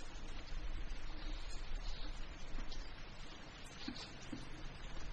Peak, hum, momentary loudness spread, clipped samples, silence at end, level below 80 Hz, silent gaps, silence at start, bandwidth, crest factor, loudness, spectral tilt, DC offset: -30 dBFS; none; 5 LU; under 0.1%; 0 s; -46 dBFS; none; 0 s; 9 kHz; 12 dB; -51 LUFS; -4 dB/octave; under 0.1%